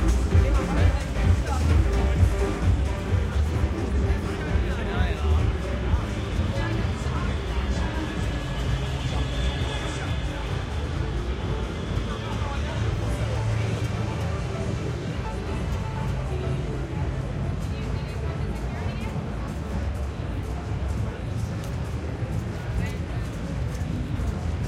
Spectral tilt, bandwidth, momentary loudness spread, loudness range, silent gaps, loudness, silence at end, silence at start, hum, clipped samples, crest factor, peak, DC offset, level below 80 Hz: -6.5 dB/octave; 12.5 kHz; 7 LU; 6 LU; none; -27 LUFS; 0 s; 0 s; none; under 0.1%; 18 dB; -8 dBFS; under 0.1%; -28 dBFS